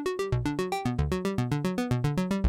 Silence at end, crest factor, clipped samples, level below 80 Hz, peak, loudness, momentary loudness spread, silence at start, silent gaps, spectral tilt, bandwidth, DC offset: 0 s; 12 dB; under 0.1%; -42 dBFS; -16 dBFS; -29 LUFS; 2 LU; 0 s; none; -7 dB/octave; 16.5 kHz; under 0.1%